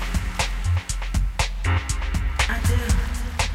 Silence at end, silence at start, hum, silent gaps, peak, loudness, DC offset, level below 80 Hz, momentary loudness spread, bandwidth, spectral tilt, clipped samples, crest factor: 0 s; 0 s; none; none; -6 dBFS; -25 LUFS; under 0.1%; -24 dBFS; 4 LU; 15.5 kHz; -4 dB/octave; under 0.1%; 16 dB